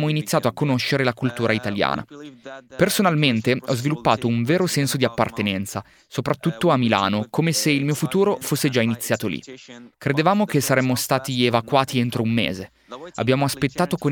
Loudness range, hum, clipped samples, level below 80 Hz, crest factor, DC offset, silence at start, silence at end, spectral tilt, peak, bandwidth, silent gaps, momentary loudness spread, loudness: 1 LU; none; under 0.1%; -56 dBFS; 20 dB; under 0.1%; 0 s; 0 s; -5 dB/octave; 0 dBFS; 19 kHz; none; 12 LU; -21 LUFS